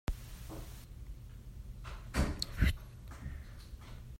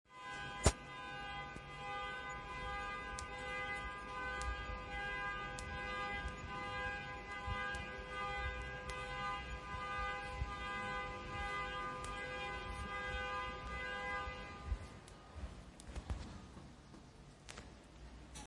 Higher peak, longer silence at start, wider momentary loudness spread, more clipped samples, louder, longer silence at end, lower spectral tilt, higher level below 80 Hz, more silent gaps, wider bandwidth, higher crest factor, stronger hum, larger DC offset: about the same, -16 dBFS vs -14 dBFS; about the same, 0.1 s vs 0.1 s; first, 17 LU vs 13 LU; neither; first, -41 LUFS vs -44 LUFS; about the same, 0.05 s vs 0 s; first, -5 dB/octave vs -3.5 dB/octave; first, -42 dBFS vs -52 dBFS; neither; first, 16 kHz vs 11.5 kHz; second, 24 dB vs 30 dB; neither; neither